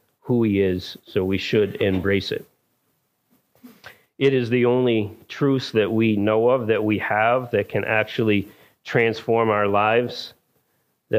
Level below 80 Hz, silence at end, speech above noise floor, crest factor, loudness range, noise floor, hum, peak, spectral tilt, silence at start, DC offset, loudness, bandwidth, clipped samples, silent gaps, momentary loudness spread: -60 dBFS; 0 s; 49 dB; 16 dB; 4 LU; -70 dBFS; none; -4 dBFS; -7 dB/octave; 0.25 s; under 0.1%; -21 LUFS; 15.5 kHz; under 0.1%; none; 9 LU